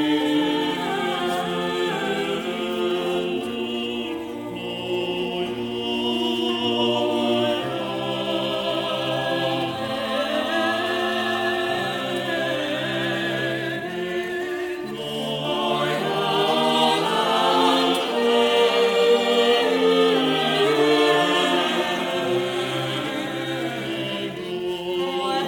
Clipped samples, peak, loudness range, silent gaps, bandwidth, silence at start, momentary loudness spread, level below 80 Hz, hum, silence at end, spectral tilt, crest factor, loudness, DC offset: under 0.1%; -6 dBFS; 7 LU; none; 20 kHz; 0 s; 9 LU; -60 dBFS; none; 0 s; -4.5 dB/octave; 16 dB; -22 LUFS; under 0.1%